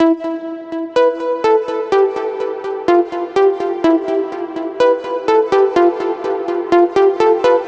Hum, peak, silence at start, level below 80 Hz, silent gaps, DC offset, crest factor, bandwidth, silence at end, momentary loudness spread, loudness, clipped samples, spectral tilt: none; -2 dBFS; 0 s; -54 dBFS; none; under 0.1%; 14 dB; 8 kHz; 0 s; 9 LU; -16 LUFS; under 0.1%; -5.5 dB/octave